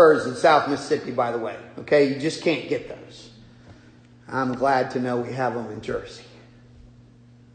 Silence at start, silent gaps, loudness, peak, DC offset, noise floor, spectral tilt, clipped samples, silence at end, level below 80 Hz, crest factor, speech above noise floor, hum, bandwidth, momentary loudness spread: 0 s; none; -23 LUFS; -4 dBFS; under 0.1%; -51 dBFS; -5.5 dB/octave; under 0.1%; 1.3 s; -58 dBFS; 20 dB; 27 dB; none; 9.6 kHz; 20 LU